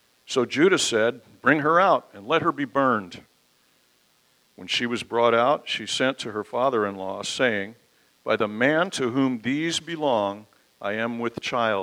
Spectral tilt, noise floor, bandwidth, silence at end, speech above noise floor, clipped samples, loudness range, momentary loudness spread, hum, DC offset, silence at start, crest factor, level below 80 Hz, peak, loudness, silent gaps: -4 dB/octave; -63 dBFS; 15.5 kHz; 0 s; 40 dB; under 0.1%; 4 LU; 11 LU; none; under 0.1%; 0.3 s; 20 dB; -70 dBFS; -4 dBFS; -24 LUFS; none